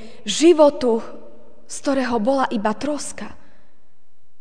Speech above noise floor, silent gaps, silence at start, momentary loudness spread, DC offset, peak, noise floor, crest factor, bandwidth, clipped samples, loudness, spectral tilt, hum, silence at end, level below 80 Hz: 40 dB; none; 0 s; 21 LU; 3%; -2 dBFS; -59 dBFS; 18 dB; 10 kHz; under 0.1%; -19 LUFS; -4 dB/octave; none; 1.1 s; -54 dBFS